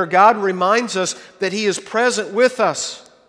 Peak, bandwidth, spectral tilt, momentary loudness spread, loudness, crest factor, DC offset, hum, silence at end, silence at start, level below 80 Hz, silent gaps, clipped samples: 0 dBFS; 11 kHz; -3 dB/octave; 11 LU; -18 LUFS; 18 dB; under 0.1%; none; 0.3 s; 0 s; -66 dBFS; none; under 0.1%